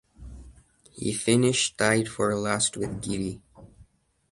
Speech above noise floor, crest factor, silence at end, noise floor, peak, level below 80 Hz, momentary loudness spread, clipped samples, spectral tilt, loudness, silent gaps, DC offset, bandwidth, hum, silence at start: 35 dB; 22 dB; 0.5 s; -60 dBFS; -6 dBFS; -52 dBFS; 15 LU; under 0.1%; -4 dB/octave; -25 LUFS; none; under 0.1%; 11.5 kHz; none; 0.2 s